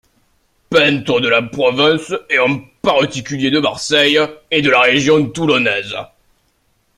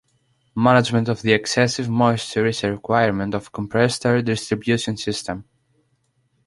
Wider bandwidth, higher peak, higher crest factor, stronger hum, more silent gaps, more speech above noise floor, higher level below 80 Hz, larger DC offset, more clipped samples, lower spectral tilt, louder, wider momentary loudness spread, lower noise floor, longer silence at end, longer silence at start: first, 13 kHz vs 11.5 kHz; about the same, 0 dBFS vs -2 dBFS; about the same, 16 dB vs 18 dB; neither; neither; about the same, 46 dB vs 47 dB; about the same, -52 dBFS vs -52 dBFS; neither; neither; about the same, -4 dB/octave vs -5 dB/octave; first, -14 LUFS vs -20 LUFS; about the same, 8 LU vs 10 LU; second, -61 dBFS vs -66 dBFS; about the same, 0.95 s vs 1.05 s; first, 0.7 s vs 0.55 s